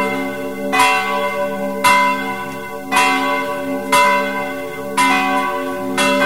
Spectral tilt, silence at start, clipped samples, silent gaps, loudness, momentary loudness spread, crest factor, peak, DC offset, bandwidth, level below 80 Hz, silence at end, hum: -3 dB/octave; 0 s; under 0.1%; none; -16 LUFS; 11 LU; 16 dB; -2 dBFS; 1%; 16 kHz; -54 dBFS; 0 s; none